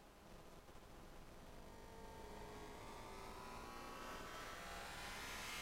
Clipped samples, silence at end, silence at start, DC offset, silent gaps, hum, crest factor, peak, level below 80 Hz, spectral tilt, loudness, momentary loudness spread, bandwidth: under 0.1%; 0 s; 0 s; under 0.1%; none; none; 16 dB; -38 dBFS; -62 dBFS; -3 dB/octave; -54 LUFS; 12 LU; 16 kHz